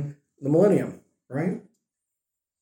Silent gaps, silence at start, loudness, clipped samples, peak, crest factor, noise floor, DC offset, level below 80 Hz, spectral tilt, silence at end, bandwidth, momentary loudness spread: none; 0 s; -24 LUFS; under 0.1%; -8 dBFS; 18 dB; -86 dBFS; under 0.1%; -72 dBFS; -9 dB/octave; 1 s; 16.5 kHz; 17 LU